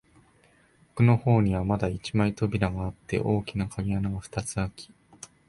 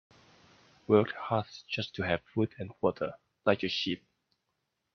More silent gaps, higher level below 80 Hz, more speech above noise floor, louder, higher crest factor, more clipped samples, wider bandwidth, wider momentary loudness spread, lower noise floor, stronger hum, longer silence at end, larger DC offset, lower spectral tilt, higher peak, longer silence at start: neither; first, -46 dBFS vs -68 dBFS; second, 35 dB vs 51 dB; first, -27 LUFS vs -32 LUFS; second, 18 dB vs 24 dB; neither; first, 11.5 kHz vs 6.6 kHz; about the same, 12 LU vs 11 LU; second, -61 dBFS vs -82 dBFS; neither; second, 0.65 s vs 0.95 s; neither; about the same, -7 dB/octave vs -6.5 dB/octave; about the same, -8 dBFS vs -10 dBFS; about the same, 0.95 s vs 0.9 s